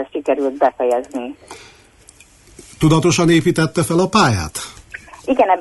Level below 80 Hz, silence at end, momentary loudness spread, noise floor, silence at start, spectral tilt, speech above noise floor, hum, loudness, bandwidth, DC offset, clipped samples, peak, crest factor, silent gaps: -44 dBFS; 0 s; 18 LU; -47 dBFS; 0 s; -5.5 dB/octave; 31 dB; none; -16 LUFS; 12 kHz; under 0.1%; under 0.1%; -2 dBFS; 16 dB; none